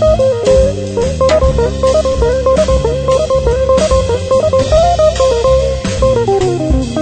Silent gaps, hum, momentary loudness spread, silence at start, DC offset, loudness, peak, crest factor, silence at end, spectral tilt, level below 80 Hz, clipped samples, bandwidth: none; none; 3 LU; 0 s; under 0.1%; -12 LUFS; 0 dBFS; 10 dB; 0 s; -6 dB/octave; -20 dBFS; under 0.1%; 9.2 kHz